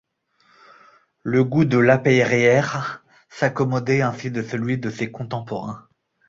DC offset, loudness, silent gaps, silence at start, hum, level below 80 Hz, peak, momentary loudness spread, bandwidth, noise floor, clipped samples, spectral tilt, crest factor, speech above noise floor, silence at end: under 0.1%; -20 LUFS; none; 1.25 s; none; -58 dBFS; -2 dBFS; 15 LU; 7.6 kHz; -62 dBFS; under 0.1%; -6.5 dB/octave; 20 dB; 42 dB; 0.5 s